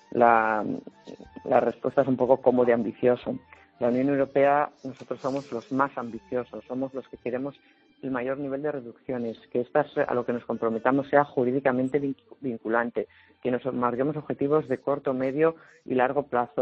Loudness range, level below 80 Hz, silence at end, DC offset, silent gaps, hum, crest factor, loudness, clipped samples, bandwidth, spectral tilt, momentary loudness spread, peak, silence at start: 8 LU; -66 dBFS; 0 s; under 0.1%; none; none; 22 dB; -26 LUFS; under 0.1%; 7.8 kHz; -8.5 dB/octave; 13 LU; -4 dBFS; 0.1 s